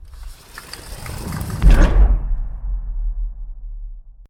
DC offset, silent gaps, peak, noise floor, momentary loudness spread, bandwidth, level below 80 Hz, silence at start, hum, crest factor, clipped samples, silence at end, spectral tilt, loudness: under 0.1%; none; 0 dBFS; -37 dBFS; 22 LU; 13.5 kHz; -18 dBFS; 0 s; none; 18 dB; under 0.1%; 0.05 s; -6 dB/octave; -21 LUFS